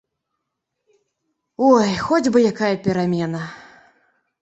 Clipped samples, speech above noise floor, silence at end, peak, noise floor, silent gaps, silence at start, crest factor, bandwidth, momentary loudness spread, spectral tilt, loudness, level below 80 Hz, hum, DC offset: under 0.1%; 61 dB; 0.8 s; -2 dBFS; -79 dBFS; none; 1.6 s; 20 dB; 8.2 kHz; 11 LU; -6 dB/octave; -18 LUFS; -56 dBFS; none; under 0.1%